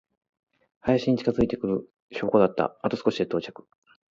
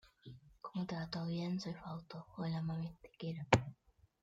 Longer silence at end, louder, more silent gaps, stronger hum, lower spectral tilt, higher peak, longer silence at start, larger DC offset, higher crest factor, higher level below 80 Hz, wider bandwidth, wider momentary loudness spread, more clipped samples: about the same, 0.6 s vs 0.5 s; first, -26 LUFS vs -40 LUFS; first, 2.02-2.08 s vs none; neither; first, -7.5 dB/octave vs -6 dB/octave; first, -6 dBFS vs -12 dBFS; first, 0.85 s vs 0.05 s; neither; second, 20 dB vs 28 dB; first, -52 dBFS vs -64 dBFS; second, 7.6 kHz vs 9.2 kHz; second, 10 LU vs 19 LU; neither